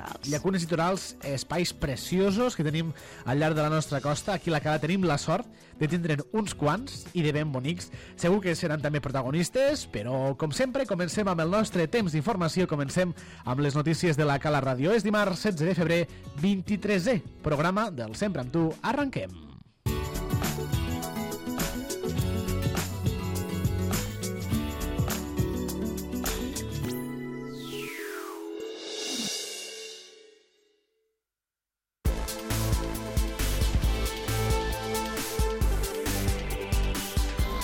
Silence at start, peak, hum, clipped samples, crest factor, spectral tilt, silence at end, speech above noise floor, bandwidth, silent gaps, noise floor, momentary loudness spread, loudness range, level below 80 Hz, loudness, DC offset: 0 s; -14 dBFS; none; under 0.1%; 16 dB; -5.5 dB/octave; 0 s; over 63 dB; 17 kHz; none; under -90 dBFS; 8 LU; 8 LU; -38 dBFS; -29 LUFS; under 0.1%